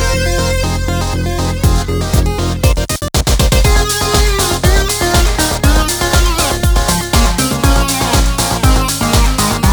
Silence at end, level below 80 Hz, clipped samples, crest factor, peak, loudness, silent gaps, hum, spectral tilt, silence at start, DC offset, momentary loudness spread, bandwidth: 0 s; -16 dBFS; under 0.1%; 12 dB; 0 dBFS; -13 LUFS; none; none; -4 dB/octave; 0 s; under 0.1%; 4 LU; over 20 kHz